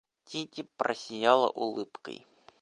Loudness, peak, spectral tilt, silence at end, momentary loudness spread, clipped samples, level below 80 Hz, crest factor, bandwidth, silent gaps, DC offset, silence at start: -30 LUFS; -8 dBFS; -4 dB/octave; 0.45 s; 19 LU; under 0.1%; -82 dBFS; 24 dB; 11 kHz; none; under 0.1%; 0.3 s